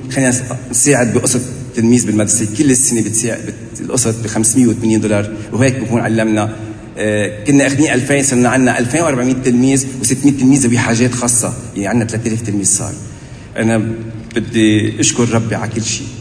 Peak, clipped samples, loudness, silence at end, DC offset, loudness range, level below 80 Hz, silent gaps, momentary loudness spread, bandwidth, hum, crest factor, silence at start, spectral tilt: 0 dBFS; under 0.1%; -13 LUFS; 0 s; under 0.1%; 3 LU; -42 dBFS; none; 10 LU; 11 kHz; none; 14 dB; 0 s; -4.5 dB/octave